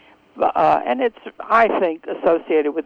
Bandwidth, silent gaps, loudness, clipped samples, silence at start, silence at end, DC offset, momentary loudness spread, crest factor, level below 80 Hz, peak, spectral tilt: 6.8 kHz; none; -19 LUFS; under 0.1%; 0.35 s; 0.05 s; under 0.1%; 7 LU; 18 dB; -56 dBFS; -2 dBFS; -6.5 dB/octave